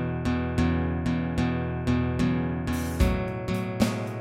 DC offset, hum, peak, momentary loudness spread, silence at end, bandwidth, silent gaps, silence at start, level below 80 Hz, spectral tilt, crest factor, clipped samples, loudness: under 0.1%; none; -8 dBFS; 4 LU; 0 s; 16 kHz; none; 0 s; -34 dBFS; -7 dB/octave; 18 dB; under 0.1%; -27 LUFS